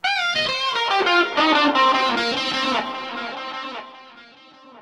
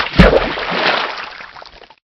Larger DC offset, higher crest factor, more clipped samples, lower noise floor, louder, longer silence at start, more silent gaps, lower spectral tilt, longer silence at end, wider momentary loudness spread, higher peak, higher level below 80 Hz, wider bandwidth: neither; about the same, 16 dB vs 16 dB; second, under 0.1% vs 0.4%; first, -47 dBFS vs -38 dBFS; second, -19 LUFS vs -14 LUFS; about the same, 0.05 s vs 0 s; neither; second, -2.5 dB/octave vs -6.5 dB/octave; second, 0 s vs 0.5 s; second, 14 LU vs 21 LU; second, -6 dBFS vs 0 dBFS; second, -62 dBFS vs -24 dBFS; first, 12.5 kHz vs 9.4 kHz